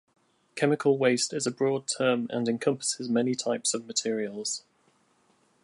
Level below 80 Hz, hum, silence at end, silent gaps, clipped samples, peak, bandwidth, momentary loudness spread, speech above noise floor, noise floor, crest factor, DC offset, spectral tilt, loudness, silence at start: -80 dBFS; none; 1.05 s; none; under 0.1%; -10 dBFS; 11.5 kHz; 7 LU; 40 dB; -67 dBFS; 20 dB; under 0.1%; -3.5 dB/octave; -27 LUFS; 0.55 s